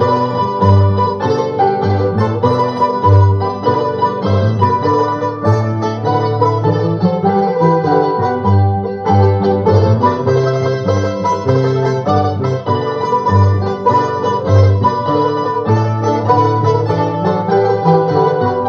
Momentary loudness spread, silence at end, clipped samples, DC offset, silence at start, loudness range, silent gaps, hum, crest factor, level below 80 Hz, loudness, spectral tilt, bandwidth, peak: 5 LU; 0 s; under 0.1%; under 0.1%; 0 s; 2 LU; none; none; 12 dB; -50 dBFS; -14 LUFS; -8.5 dB/octave; 6.8 kHz; 0 dBFS